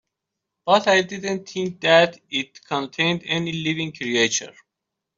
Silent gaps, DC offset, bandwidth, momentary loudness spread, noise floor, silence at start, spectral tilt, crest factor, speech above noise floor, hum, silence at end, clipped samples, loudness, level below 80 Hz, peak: none; under 0.1%; 7.8 kHz; 11 LU; -83 dBFS; 0.65 s; -3.5 dB/octave; 20 dB; 61 dB; none; 0.65 s; under 0.1%; -21 LUFS; -66 dBFS; -4 dBFS